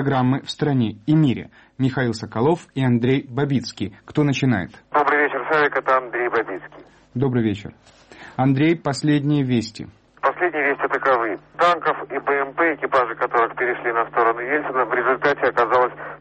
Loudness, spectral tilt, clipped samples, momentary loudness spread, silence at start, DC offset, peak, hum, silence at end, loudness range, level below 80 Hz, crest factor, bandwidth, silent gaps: -20 LUFS; -7 dB/octave; under 0.1%; 7 LU; 0 s; under 0.1%; -6 dBFS; none; 0.05 s; 2 LU; -56 dBFS; 14 dB; 8.4 kHz; none